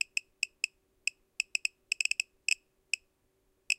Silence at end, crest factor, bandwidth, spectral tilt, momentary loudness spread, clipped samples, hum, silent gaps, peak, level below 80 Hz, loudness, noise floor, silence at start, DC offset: 0.05 s; 28 dB; 16.5 kHz; 5 dB/octave; 6 LU; under 0.1%; none; none; -8 dBFS; -78 dBFS; -34 LUFS; -74 dBFS; 0.15 s; under 0.1%